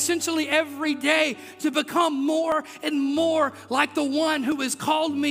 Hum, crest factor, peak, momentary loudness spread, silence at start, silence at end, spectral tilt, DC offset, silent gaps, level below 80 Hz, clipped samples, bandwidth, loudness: none; 20 dB; -4 dBFS; 4 LU; 0 s; 0 s; -2.5 dB/octave; under 0.1%; none; -70 dBFS; under 0.1%; 16 kHz; -24 LUFS